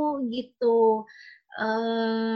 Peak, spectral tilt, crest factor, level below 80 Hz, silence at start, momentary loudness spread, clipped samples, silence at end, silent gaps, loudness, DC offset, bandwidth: -12 dBFS; -7 dB/octave; 14 dB; -76 dBFS; 0 s; 12 LU; under 0.1%; 0 s; none; -26 LUFS; under 0.1%; 6 kHz